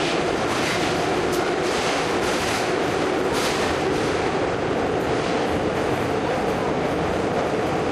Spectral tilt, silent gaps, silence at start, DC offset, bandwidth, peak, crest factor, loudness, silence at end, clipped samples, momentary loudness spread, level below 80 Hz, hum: -4.5 dB/octave; none; 0 s; under 0.1%; 15 kHz; -10 dBFS; 12 dB; -22 LUFS; 0 s; under 0.1%; 1 LU; -44 dBFS; none